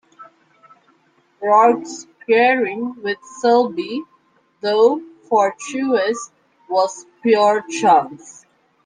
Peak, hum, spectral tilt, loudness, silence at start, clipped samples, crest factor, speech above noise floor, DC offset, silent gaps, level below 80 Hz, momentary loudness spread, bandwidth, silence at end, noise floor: -2 dBFS; none; -3.5 dB/octave; -18 LUFS; 0.2 s; under 0.1%; 16 dB; 42 dB; under 0.1%; none; -72 dBFS; 13 LU; 9.8 kHz; 0.55 s; -59 dBFS